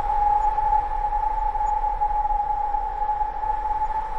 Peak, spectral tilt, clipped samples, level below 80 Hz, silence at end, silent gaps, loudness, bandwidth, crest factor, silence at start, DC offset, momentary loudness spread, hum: -12 dBFS; -6 dB/octave; under 0.1%; -32 dBFS; 0 s; none; -24 LUFS; 7.4 kHz; 12 dB; 0 s; under 0.1%; 5 LU; none